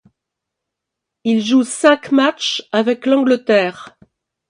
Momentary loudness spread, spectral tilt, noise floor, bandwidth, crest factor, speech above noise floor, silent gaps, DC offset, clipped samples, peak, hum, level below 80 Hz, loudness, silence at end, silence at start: 6 LU; -4 dB/octave; -81 dBFS; 11.5 kHz; 16 dB; 66 dB; none; under 0.1%; under 0.1%; 0 dBFS; none; -68 dBFS; -15 LUFS; 0.6 s; 1.25 s